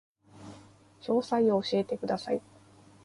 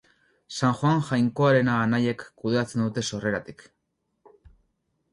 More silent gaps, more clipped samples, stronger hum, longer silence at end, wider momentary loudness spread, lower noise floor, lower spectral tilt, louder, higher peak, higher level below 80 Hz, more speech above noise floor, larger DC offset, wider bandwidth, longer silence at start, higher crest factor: neither; neither; neither; second, 0.65 s vs 1.5 s; first, 23 LU vs 11 LU; second, -57 dBFS vs -77 dBFS; about the same, -6.5 dB/octave vs -6 dB/octave; second, -29 LUFS vs -25 LUFS; second, -16 dBFS vs -8 dBFS; second, -70 dBFS vs -60 dBFS; second, 28 dB vs 53 dB; neither; about the same, 11.5 kHz vs 11.5 kHz; second, 0.35 s vs 0.5 s; about the same, 16 dB vs 18 dB